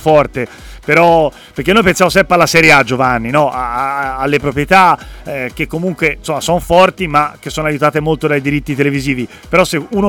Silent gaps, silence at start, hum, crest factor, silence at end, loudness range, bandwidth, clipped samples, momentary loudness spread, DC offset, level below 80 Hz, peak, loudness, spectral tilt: none; 0 s; none; 12 dB; 0 s; 4 LU; 19 kHz; under 0.1%; 10 LU; under 0.1%; -34 dBFS; 0 dBFS; -12 LUFS; -5 dB/octave